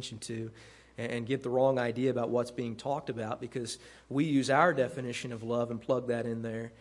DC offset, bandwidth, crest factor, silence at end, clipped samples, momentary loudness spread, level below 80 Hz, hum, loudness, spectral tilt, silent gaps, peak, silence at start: under 0.1%; 11.5 kHz; 22 dB; 0.05 s; under 0.1%; 12 LU; -66 dBFS; none; -32 LUFS; -5.5 dB/octave; none; -10 dBFS; 0 s